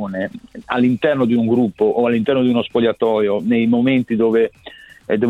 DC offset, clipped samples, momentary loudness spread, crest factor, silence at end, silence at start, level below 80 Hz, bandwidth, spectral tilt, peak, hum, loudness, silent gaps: under 0.1%; under 0.1%; 8 LU; 14 dB; 0 s; 0 s; -54 dBFS; 4.2 kHz; -8 dB/octave; -2 dBFS; none; -17 LUFS; none